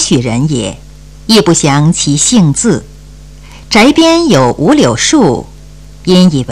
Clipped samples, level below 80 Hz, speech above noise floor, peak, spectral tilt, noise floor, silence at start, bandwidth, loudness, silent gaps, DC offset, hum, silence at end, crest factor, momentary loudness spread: under 0.1%; -34 dBFS; 24 dB; 0 dBFS; -4.5 dB/octave; -32 dBFS; 0 s; 14 kHz; -8 LUFS; none; 1%; none; 0 s; 10 dB; 10 LU